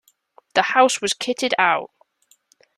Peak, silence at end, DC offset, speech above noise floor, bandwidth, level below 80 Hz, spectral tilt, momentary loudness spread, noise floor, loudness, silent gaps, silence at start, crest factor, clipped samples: -2 dBFS; 0.9 s; under 0.1%; 42 dB; 13.5 kHz; -68 dBFS; -1.5 dB/octave; 7 LU; -61 dBFS; -19 LUFS; none; 0.55 s; 20 dB; under 0.1%